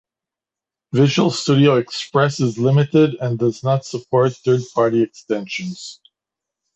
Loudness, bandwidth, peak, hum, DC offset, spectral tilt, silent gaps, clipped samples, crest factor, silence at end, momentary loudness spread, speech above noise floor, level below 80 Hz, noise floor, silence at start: -18 LUFS; 8.2 kHz; -2 dBFS; none; under 0.1%; -6.5 dB/octave; none; under 0.1%; 16 dB; 0.85 s; 10 LU; 71 dB; -60 dBFS; -88 dBFS; 0.95 s